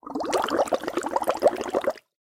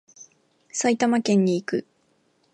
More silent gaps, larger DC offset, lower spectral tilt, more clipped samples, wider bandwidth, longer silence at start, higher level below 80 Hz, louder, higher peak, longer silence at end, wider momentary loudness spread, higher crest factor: neither; neither; second, -3.5 dB/octave vs -5 dB/octave; neither; first, 17 kHz vs 10.5 kHz; second, 0.05 s vs 0.2 s; first, -60 dBFS vs -74 dBFS; second, -26 LUFS vs -23 LUFS; first, -6 dBFS vs -10 dBFS; second, 0.2 s vs 0.75 s; second, 5 LU vs 10 LU; about the same, 20 dB vs 16 dB